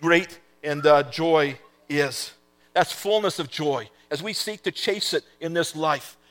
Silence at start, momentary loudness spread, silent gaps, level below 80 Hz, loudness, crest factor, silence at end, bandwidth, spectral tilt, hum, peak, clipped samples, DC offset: 0 s; 12 LU; none; -72 dBFS; -24 LUFS; 22 dB; 0.2 s; 17.5 kHz; -4 dB/octave; none; -2 dBFS; under 0.1%; under 0.1%